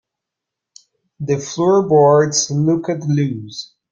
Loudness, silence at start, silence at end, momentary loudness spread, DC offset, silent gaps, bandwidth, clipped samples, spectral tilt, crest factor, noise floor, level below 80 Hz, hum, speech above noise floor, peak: -16 LUFS; 1.2 s; 0.25 s; 17 LU; under 0.1%; none; 8.8 kHz; under 0.1%; -5.5 dB/octave; 16 dB; -82 dBFS; -60 dBFS; none; 67 dB; -2 dBFS